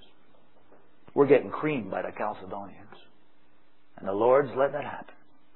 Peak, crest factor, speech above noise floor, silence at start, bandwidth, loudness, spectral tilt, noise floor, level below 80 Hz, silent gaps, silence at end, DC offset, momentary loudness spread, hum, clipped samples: -6 dBFS; 22 dB; 40 dB; 1.15 s; 4.2 kHz; -27 LUFS; -10.5 dB/octave; -66 dBFS; -72 dBFS; none; 0.5 s; 0.5%; 18 LU; none; under 0.1%